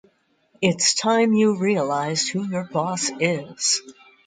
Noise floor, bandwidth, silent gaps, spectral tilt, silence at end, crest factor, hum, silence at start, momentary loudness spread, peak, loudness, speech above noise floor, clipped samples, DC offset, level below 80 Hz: -62 dBFS; 9.6 kHz; none; -3.5 dB/octave; 0.35 s; 18 dB; none; 0.6 s; 7 LU; -4 dBFS; -21 LUFS; 41 dB; under 0.1%; under 0.1%; -68 dBFS